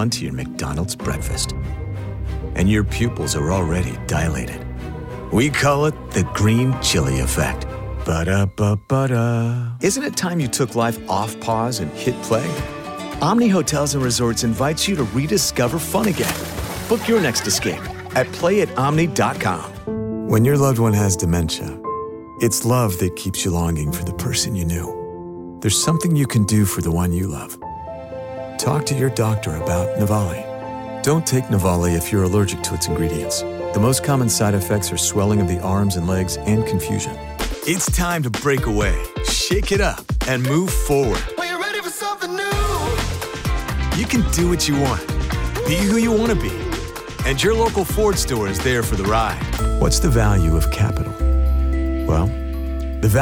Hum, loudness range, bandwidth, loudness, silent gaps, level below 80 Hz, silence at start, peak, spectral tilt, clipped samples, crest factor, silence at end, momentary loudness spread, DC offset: none; 3 LU; 17 kHz; -20 LUFS; none; -28 dBFS; 0 s; -6 dBFS; -5 dB/octave; under 0.1%; 12 dB; 0 s; 10 LU; under 0.1%